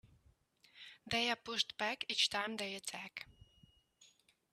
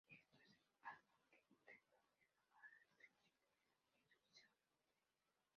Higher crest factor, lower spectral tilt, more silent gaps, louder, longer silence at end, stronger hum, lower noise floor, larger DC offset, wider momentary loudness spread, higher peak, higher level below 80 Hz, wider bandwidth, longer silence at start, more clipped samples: about the same, 24 dB vs 28 dB; about the same, -1.5 dB/octave vs -1 dB/octave; neither; first, -37 LUFS vs -66 LUFS; first, 0.45 s vs 0.15 s; neither; second, -71 dBFS vs under -90 dBFS; neither; first, 21 LU vs 8 LU; first, -18 dBFS vs -44 dBFS; first, -74 dBFS vs under -90 dBFS; first, 14.5 kHz vs 6.6 kHz; about the same, 0.05 s vs 0.05 s; neither